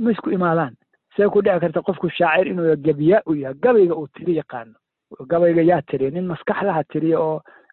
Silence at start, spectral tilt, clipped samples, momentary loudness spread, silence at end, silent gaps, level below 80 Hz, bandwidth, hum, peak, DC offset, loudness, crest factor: 0 s; -11 dB/octave; under 0.1%; 9 LU; 0.35 s; none; -60 dBFS; 4.3 kHz; none; -4 dBFS; under 0.1%; -19 LUFS; 14 dB